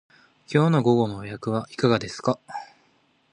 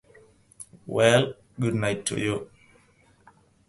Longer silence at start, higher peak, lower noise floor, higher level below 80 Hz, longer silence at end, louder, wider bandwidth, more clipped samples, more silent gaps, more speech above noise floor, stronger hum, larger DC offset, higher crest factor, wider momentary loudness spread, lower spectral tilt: about the same, 0.5 s vs 0.6 s; about the same, -6 dBFS vs -4 dBFS; first, -64 dBFS vs -60 dBFS; about the same, -60 dBFS vs -58 dBFS; second, 0.7 s vs 1.25 s; about the same, -24 LUFS vs -25 LUFS; second, 10.5 kHz vs 12 kHz; neither; neither; first, 41 dB vs 36 dB; neither; neither; about the same, 20 dB vs 22 dB; second, 12 LU vs 25 LU; first, -7 dB/octave vs -4.5 dB/octave